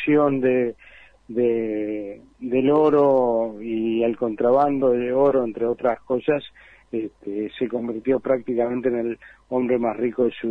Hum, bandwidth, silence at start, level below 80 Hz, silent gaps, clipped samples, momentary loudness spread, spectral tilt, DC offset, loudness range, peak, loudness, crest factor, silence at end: none; 4.7 kHz; 0 s; -58 dBFS; none; under 0.1%; 12 LU; -9 dB/octave; under 0.1%; 5 LU; -8 dBFS; -22 LUFS; 14 dB; 0 s